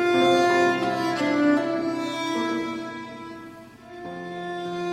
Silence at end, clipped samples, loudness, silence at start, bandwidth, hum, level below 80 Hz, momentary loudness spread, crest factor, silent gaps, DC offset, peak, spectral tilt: 0 s; under 0.1%; -24 LUFS; 0 s; 13.5 kHz; none; -64 dBFS; 20 LU; 16 dB; none; under 0.1%; -8 dBFS; -5 dB/octave